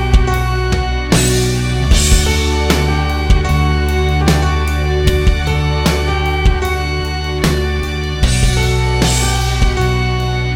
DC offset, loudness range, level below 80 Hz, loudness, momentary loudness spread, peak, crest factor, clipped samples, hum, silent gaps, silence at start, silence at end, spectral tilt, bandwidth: 0.4%; 2 LU; -16 dBFS; -14 LUFS; 4 LU; 0 dBFS; 12 dB; under 0.1%; none; none; 0 s; 0 s; -4.5 dB/octave; 16.5 kHz